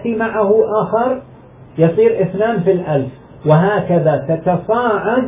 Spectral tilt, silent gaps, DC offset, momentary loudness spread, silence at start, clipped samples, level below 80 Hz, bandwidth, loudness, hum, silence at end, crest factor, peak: -12 dB/octave; none; under 0.1%; 7 LU; 0 s; under 0.1%; -48 dBFS; 3.8 kHz; -15 LUFS; none; 0 s; 14 dB; 0 dBFS